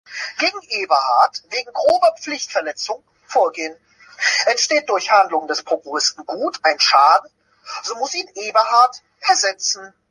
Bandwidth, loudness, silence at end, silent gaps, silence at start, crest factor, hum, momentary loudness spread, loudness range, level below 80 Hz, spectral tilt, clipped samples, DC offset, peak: 11.5 kHz; -18 LUFS; 0.2 s; none; 0.1 s; 18 dB; none; 12 LU; 3 LU; -70 dBFS; 1 dB/octave; under 0.1%; under 0.1%; -2 dBFS